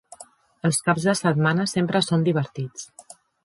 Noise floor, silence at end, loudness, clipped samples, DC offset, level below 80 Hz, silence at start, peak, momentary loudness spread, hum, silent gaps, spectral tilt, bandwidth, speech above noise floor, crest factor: -49 dBFS; 0.45 s; -22 LUFS; under 0.1%; under 0.1%; -64 dBFS; 0.2 s; -4 dBFS; 13 LU; none; none; -5 dB/octave; 11.5 kHz; 27 dB; 18 dB